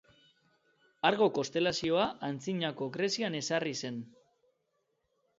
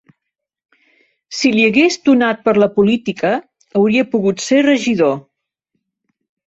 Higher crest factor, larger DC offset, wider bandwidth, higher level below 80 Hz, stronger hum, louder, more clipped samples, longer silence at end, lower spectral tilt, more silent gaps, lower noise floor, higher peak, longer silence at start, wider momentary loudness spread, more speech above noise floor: first, 22 dB vs 14 dB; neither; about the same, 7.8 kHz vs 8 kHz; second, -72 dBFS vs -58 dBFS; neither; second, -32 LUFS vs -14 LUFS; neither; about the same, 1.3 s vs 1.25 s; about the same, -4 dB/octave vs -5 dB/octave; neither; about the same, -79 dBFS vs -79 dBFS; second, -12 dBFS vs -2 dBFS; second, 1.05 s vs 1.3 s; first, 10 LU vs 7 LU; second, 47 dB vs 66 dB